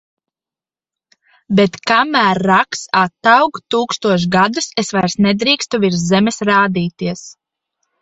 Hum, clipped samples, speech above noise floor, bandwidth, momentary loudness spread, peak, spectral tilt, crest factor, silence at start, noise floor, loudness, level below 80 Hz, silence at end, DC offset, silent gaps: none; under 0.1%; over 76 dB; 8.2 kHz; 7 LU; 0 dBFS; -4.5 dB/octave; 16 dB; 1.5 s; under -90 dBFS; -14 LUFS; -54 dBFS; 0.7 s; under 0.1%; none